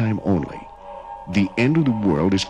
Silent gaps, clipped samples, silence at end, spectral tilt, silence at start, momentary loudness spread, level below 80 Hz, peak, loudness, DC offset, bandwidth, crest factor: none; under 0.1%; 0 s; -6.5 dB/octave; 0 s; 19 LU; -46 dBFS; -10 dBFS; -20 LUFS; under 0.1%; 11 kHz; 12 dB